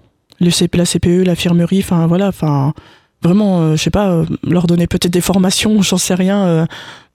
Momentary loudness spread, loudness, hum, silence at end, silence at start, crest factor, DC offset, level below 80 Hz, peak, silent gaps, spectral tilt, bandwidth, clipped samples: 5 LU; -13 LUFS; none; 0.2 s; 0.4 s; 12 dB; under 0.1%; -36 dBFS; 0 dBFS; none; -5.5 dB/octave; 15.5 kHz; under 0.1%